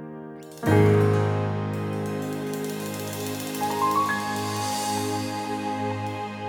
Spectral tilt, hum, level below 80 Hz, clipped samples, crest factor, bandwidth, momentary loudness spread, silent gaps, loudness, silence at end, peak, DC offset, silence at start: -5.5 dB/octave; none; -58 dBFS; under 0.1%; 20 dB; 19 kHz; 10 LU; none; -26 LUFS; 0 s; -6 dBFS; under 0.1%; 0 s